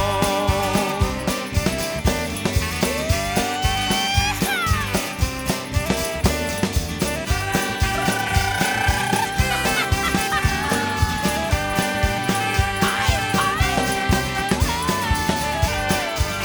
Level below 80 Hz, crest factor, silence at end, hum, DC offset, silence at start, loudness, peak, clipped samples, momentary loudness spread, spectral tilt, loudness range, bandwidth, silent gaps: -30 dBFS; 18 dB; 0 s; none; under 0.1%; 0 s; -21 LUFS; -2 dBFS; under 0.1%; 3 LU; -4 dB/octave; 2 LU; over 20 kHz; none